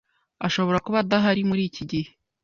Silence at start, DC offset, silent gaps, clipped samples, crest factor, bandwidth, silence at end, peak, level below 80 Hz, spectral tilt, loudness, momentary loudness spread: 0.4 s; under 0.1%; none; under 0.1%; 16 dB; 7.2 kHz; 0.35 s; -8 dBFS; -56 dBFS; -6 dB/octave; -24 LUFS; 10 LU